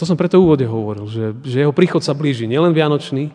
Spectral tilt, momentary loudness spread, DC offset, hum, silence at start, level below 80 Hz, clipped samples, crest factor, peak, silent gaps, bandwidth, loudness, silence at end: -7.5 dB/octave; 11 LU; under 0.1%; none; 0 s; -50 dBFS; under 0.1%; 16 dB; 0 dBFS; none; 10 kHz; -16 LUFS; 0 s